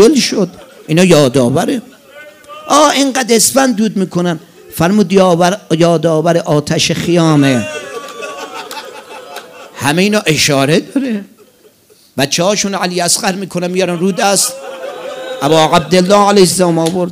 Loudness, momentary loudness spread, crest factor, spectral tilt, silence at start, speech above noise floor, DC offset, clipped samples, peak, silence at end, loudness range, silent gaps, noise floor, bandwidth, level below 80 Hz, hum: -11 LUFS; 17 LU; 12 dB; -4 dB/octave; 0 s; 36 dB; under 0.1%; 0.4%; 0 dBFS; 0 s; 4 LU; none; -46 dBFS; 16.5 kHz; -48 dBFS; none